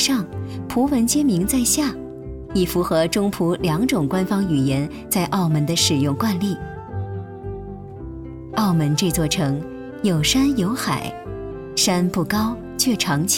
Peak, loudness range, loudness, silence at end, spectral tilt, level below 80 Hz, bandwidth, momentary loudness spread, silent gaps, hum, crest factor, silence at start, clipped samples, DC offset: -6 dBFS; 4 LU; -20 LUFS; 0 s; -4.5 dB/octave; -42 dBFS; 18 kHz; 15 LU; none; none; 16 dB; 0 s; under 0.1%; under 0.1%